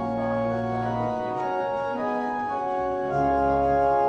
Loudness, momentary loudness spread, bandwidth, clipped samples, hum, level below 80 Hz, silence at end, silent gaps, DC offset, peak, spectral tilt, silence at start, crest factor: -26 LUFS; 6 LU; 8.8 kHz; under 0.1%; none; -46 dBFS; 0 s; none; under 0.1%; -12 dBFS; -8 dB/octave; 0 s; 14 dB